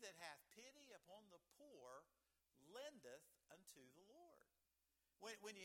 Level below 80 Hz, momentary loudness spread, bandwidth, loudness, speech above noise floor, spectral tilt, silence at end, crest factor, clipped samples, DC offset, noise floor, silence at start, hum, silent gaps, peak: under -90 dBFS; 10 LU; 17.5 kHz; -62 LUFS; 27 dB; -2 dB/octave; 0 s; 26 dB; under 0.1%; under 0.1%; -89 dBFS; 0 s; none; none; -38 dBFS